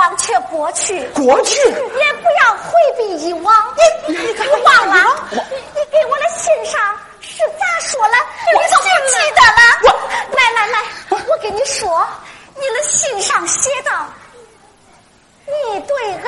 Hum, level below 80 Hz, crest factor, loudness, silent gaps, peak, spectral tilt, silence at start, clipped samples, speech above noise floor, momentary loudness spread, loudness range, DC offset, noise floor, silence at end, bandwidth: none; -48 dBFS; 14 dB; -13 LUFS; none; 0 dBFS; -0.5 dB/octave; 0 s; under 0.1%; 35 dB; 12 LU; 7 LU; under 0.1%; -48 dBFS; 0 s; 11.5 kHz